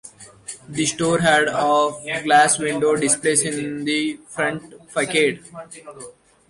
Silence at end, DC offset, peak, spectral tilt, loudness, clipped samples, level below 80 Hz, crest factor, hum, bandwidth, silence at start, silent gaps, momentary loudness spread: 0.4 s; under 0.1%; -4 dBFS; -3 dB/octave; -19 LUFS; under 0.1%; -58 dBFS; 16 dB; none; 11.5 kHz; 0.05 s; none; 21 LU